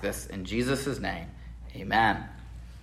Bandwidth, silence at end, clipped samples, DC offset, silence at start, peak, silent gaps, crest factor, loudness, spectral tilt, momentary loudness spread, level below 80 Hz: 16 kHz; 0 s; under 0.1%; under 0.1%; 0 s; -10 dBFS; none; 20 dB; -29 LUFS; -4.5 dB/octave; 21 LU; -44 dBFS